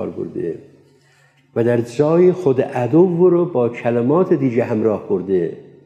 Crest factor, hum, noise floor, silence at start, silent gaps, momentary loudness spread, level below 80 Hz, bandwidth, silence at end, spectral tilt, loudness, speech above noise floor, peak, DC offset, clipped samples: 14 dB; none; -54 dBFS; 0 s; none; 12 LU; -64 dBFS; 8.6 kHz; 0.25 s; -9 dB/octave; -17 LUFS; 38 dB; -4 dBFS; under 0.1%; under 0.1%